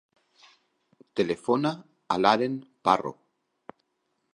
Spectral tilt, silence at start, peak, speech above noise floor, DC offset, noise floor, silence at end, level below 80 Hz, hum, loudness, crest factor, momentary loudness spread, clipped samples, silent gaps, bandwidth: -5.5 dB/octave; 1.15 s; -4 dBFS; 51 dB; under 0.1%; -76 dBFS; 1.25 s; -68 dBFS; none; -26 LUFS; 24 dB; 12 LU; under 0.1%; none; 11 kHz